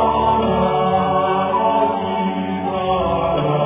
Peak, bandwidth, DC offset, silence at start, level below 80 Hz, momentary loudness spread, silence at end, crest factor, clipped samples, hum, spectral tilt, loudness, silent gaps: -4 dBFS; 3.8 kHz; under 0.1%; 0 s; -38 dBFS; 5 LU; 0 s; 14 dB; under 0.1%; none; -10.5 dB/octave; -18 LUFS; none